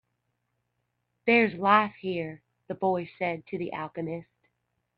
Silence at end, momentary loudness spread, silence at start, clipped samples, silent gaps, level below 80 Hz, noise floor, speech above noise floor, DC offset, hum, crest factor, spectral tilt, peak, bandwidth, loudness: 0.75 s; 14 LU; 1.25 s; under 0.1%; none; -70 dBFS; -79 dBFS; 52 dB; under 0.1%; 60 Hz at -55 dBFS; 22 dB; -8.5 dB/octave; -8 dBFS; 5.6 kHz; -27 LUFS